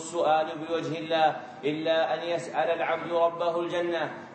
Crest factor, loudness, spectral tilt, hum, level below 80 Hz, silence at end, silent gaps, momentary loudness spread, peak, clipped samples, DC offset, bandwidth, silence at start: 16 dB; -28 LUFS; -4.5 dB/octave; none; -82 dBFS; 0 s; none; 6 LU; -12 dBFS; under 0.1%; under 0.1%; 8.4 kHz; 0 s